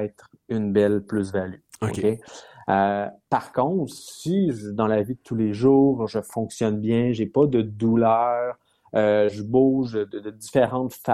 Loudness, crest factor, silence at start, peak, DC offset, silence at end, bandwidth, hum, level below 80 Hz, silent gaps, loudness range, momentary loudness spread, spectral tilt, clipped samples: -23 LUFS; 16 dB; 0 s; -6 dBFS; under 0.1%; 0 s; 14.5 kHz; none; -56 dBFS; none; 4 LU; 12 LU; -7 dB/octave; under 0.1%